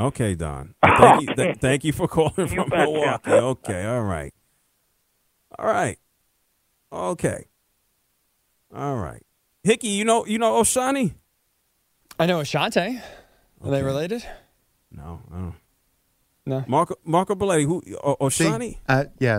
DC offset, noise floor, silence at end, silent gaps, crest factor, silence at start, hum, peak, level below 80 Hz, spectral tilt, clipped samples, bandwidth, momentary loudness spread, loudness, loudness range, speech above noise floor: under 0.1%; -69 dBFS; 0 s; none; 24 dB; 0 s; none; 0 dBFS; -48 dBFS; -5 dB/octave; under 0.1%; 16 kHz; 17 LU; -22 LUFS; 11 LU; 48 dB